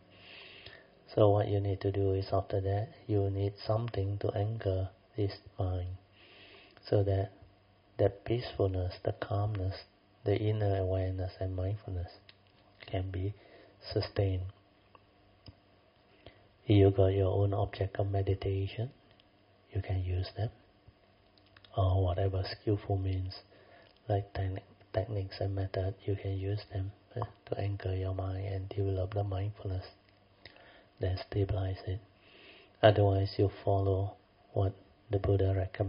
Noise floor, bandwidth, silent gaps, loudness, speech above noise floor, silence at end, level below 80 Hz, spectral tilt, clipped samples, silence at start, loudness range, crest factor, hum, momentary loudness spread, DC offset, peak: -65 dBFS; 5.4 kHz; none; -33 LUFS; 33 dB; 0 s; -56 dBFS; -7 dB/octave; under 0.1%; 0.25 s; 7 LU; 26 dB; none; 13 LU; under 0.1%; -6 dBFS